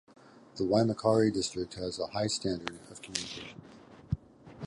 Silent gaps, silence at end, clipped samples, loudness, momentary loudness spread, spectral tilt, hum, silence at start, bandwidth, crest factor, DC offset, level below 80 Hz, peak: none; 0 s; under 0.1%; -32 LUFS; 18 LU; -5 dB/octave; none; 0.35 s; 11.5 kHz; 24 dB; under 0.1%; -56 dBFS; -8 dBFS